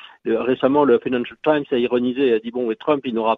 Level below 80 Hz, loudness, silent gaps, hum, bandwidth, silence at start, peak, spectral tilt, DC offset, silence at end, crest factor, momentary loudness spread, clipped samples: -60 dBFS; -20 LUFS; none; none; 4.4 kHz; 0.05 s; -4 dBFS; -8.5 dB/octave; under 0.1%; 0 s; 16 dB; 7 LU; under 0.1%